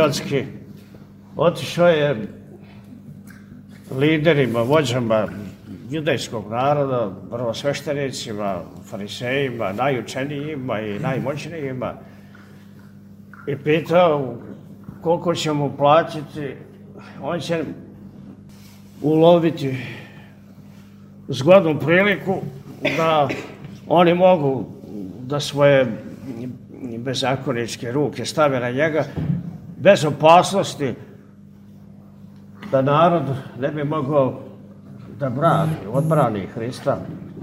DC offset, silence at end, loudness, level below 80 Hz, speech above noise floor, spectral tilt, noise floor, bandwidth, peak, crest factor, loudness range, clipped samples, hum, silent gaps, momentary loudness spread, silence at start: under 0.1%; 0 s; -20 LUFS; -56 dBFS; 25 dB; -6 dB/octave; -44 dBFS; 16 kHz; 0 dBFS; 20 dB; 6 LU; under 0.1%; none; none; 21 LU; 0 s